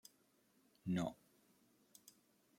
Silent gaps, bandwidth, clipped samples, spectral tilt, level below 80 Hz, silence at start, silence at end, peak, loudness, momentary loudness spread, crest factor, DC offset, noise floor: none; 16.5 kHz; under 0.1%; -6.5 dB/octave; -78 dBFS; 0.85 s; 1.45 s; -28 dBFS; -44 LUFS; 24 LU; 22 dB; under 0.1%; -76 dBFS